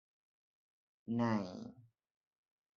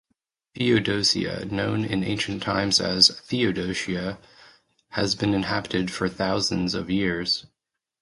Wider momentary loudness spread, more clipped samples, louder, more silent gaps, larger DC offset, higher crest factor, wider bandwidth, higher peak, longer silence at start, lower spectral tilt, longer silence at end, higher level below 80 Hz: first, 19 LU vs 9 LU; neither; second, -38 LUFS vs -24 LUFS; neither; neither; about the same, 22 dB vs 22 dB; second, 7 kHz vs 11.5 kHz; second, -22 dBFS vs -2 dBFS; first, 1.05 s vs 0.55 s; first, -7 dB/octave vs -4 dB/octave; first, 0.95 s vs 0.55 s; second, -78 dBFS vs -50 dBFS